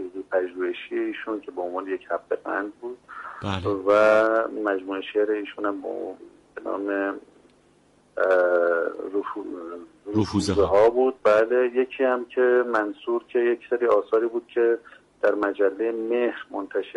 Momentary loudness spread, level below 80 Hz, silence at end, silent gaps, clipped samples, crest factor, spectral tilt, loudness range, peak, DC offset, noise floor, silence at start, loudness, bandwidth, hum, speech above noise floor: 14 LU; -56 dBFS; 0.05 s; none; under 0.1%; 16 dB; -6 dB/octave; 8 LU; -8 dBFS; under 0.1%; -59 dBFS; 0 s; -24 LUFS; 11.5 kHz; none; 36 dB